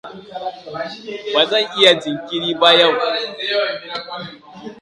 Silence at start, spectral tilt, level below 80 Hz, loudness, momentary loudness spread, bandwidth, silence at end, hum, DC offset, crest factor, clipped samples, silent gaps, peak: 0.05 s; -3 dB/octave; -64 dBFS; -15 LUFS; 19 LU; 11.5 kHz; 0 s; none; under 0.1%; 18 dB; under 0.1%; none; 0 dBFS